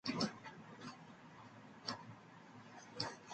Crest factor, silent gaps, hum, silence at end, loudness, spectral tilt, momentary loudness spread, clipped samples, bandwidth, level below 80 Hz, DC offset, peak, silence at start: 26 dB; none; none; 0 s; -48 LUFS; -4 dB/octave; 16 LU; under 0.1%; 9 kHz; -80 dBFS; under 0.1%; -22 dBFS; 0.05 s